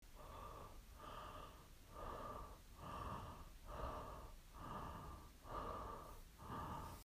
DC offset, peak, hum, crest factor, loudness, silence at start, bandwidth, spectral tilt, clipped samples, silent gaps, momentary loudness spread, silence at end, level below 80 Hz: under 0.1%; -34 dBFS; none; 18 dB; -54 LUFS; 0 s; 15.5 kHz; -5.5 dB/octave; under 0.1%; none; 9 LU; 0.05 s; -60 dBFS